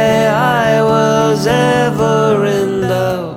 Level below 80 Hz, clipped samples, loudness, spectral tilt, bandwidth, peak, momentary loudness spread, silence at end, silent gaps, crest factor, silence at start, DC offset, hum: -42 dBFS; under 0.1%; -12 LUFS; -5.5 dB/octave; 18.5 kHz; 0 dBFS; 4 LU; 0 s; none; 12 dB; 0 s; 0.1%; none